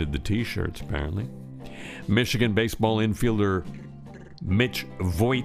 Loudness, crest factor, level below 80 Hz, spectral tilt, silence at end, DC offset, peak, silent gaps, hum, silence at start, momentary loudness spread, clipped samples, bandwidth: -26 LUFS; 18 dB; -40 dBFS; -6 dB/octave; 0 s; under 0.1%; -8 dBFS; none; none; 0 s; 18 LU; under 0.1%; 15.5 kHz